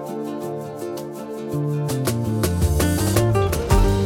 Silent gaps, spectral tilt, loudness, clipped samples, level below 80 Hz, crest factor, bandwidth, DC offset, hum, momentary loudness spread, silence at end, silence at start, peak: none; -6 dB/octave; -22 LUFS; under 0.1%; -28 dBFS; 18 dB; 17.5 kHz; under 0.1%; none; 11 LU; 0 s; 0 s; -2 dBFS